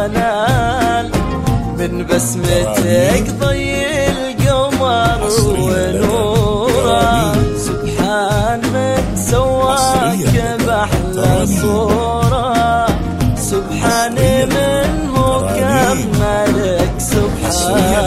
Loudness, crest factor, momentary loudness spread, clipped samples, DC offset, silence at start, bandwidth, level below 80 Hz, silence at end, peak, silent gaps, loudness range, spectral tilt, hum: -14 LUFS; 14 dB; 4 LU; under 0.1%; under 0.1%; 0 s; 16 kHz; -26 dBFS; 0 s; 0 dBFS; none; 1 LU; -5 dB/octave; none